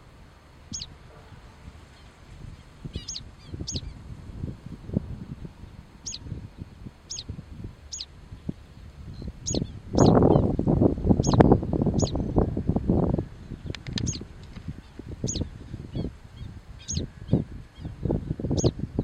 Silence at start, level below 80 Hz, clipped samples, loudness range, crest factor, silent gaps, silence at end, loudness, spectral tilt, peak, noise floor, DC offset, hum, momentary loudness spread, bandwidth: 0.05 s; -38 dBFS; under 0.1%; 17 LU; 28 dB; none; 0 s; -27 LUFS; -6.5 dB/octave; 0 dBFS; -50 dBFS; under 0.1%; none; 22 LU; 9.6 kHz